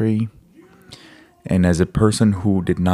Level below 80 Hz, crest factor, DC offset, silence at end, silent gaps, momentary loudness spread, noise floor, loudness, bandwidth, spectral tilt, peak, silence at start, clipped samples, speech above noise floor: -40 dBFS; 18 dB; under 0.1%; 0 s; none; 9 LU; -48 dBFS; -18 LUFS; 13 kHz; -7 dB/octave; -2 dBFS; 0 s; under 0.1%; 31 dB